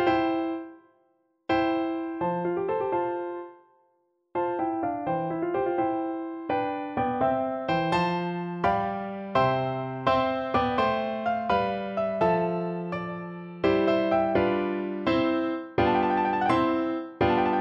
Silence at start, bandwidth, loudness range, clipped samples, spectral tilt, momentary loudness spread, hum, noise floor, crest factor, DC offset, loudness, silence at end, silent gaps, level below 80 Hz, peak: 0 s; 7.4 kHz; 5 LU; under 0.1%; -8 dB/octave; 9 LU; none; -70 dBFS; 18 dB; under 0.1%; -27 LUFS; 0 s; none; -54 dBFS; -10 dBFS